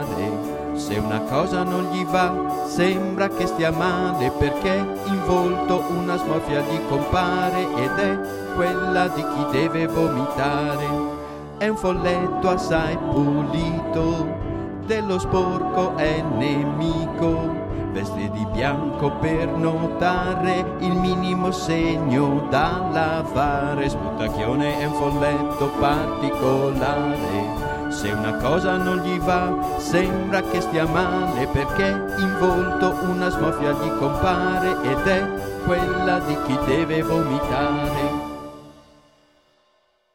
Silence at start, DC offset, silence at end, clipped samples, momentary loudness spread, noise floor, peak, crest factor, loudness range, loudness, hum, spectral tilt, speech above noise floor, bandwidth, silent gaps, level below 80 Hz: 0 s; under 0.1%; 1.4 s; under 0.1%; 5 LU; -64 dBFS; -6 dBFS; 16 dB; 2 LU; -22 LUFS; none; -6.5 dB/octave; 43 dB; 17 kHz; none; -38 dBFS